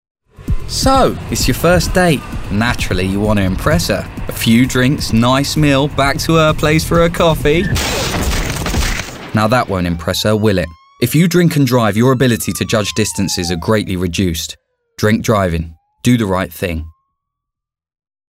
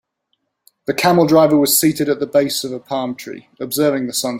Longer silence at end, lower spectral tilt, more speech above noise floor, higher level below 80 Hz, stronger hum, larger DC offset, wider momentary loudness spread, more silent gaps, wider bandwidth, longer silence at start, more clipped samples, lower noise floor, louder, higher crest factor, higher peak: first, 1.4 s vs 0 s; about the same, -5 dB/octave vs -4 dB/octave; first, 69 dB vs 54 dB; first, -26 dBFS vs -58 dBFS; neither; neither; second, 8 LU vs 16 LU; neither; about the same, 16.5 kHz vs 16.5 kHz; second, 0.4 s vs 0.9 s; neither; first, -82 dBFS vs -70 dBFS; about the same, -14 LUFS vs -16 LUFS; about the same, 14 dB vs 16 dB; about the same, 0 dBFS vs 0 dBFS